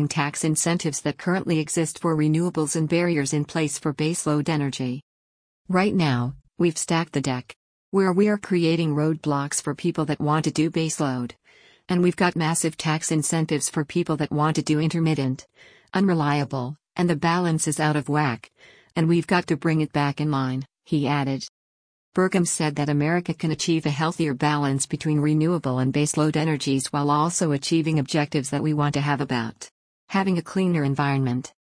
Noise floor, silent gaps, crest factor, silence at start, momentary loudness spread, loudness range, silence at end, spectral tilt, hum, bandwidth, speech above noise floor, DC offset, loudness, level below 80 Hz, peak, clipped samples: -53 dBFS; 5.02-5.65 s, 7.56-7.92 s, 21.49-22.12 s, 29.71-30.08 s; 16 dB; 0 s; 6 LU; 2 LU; 0.25 s; -5.5 dB/octave; none; 10.5 kHz; 30 dB; under 0.1%; -23 LUFS; -60 dBFS; -8 dBFS; under 0.1%